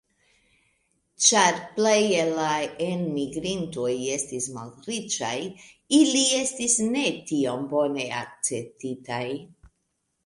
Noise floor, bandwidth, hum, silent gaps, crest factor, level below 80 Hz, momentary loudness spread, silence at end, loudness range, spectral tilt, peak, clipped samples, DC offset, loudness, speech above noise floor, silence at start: -76 dBFS; 11.5 kHz; none; none; 22 dB; -64 dBFS; 13 LU; 0.6 s; 5 LU; -2.5 dB/octave; -4 dBFS; under 0.1%; under 0.1%; -24 LUFS; 51 dB; 1.2 s